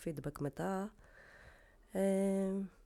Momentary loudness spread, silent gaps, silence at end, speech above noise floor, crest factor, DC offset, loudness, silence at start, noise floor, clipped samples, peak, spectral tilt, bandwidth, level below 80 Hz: 15 LU; none; 0.15 s; 25 dB; 16 dB; under 0.1%; -38 LUFS; 0 s; -62 dBFS; under 0.1%; -22 dBFS; -7.5 dB/octave; 14 kHz; -64 dBFS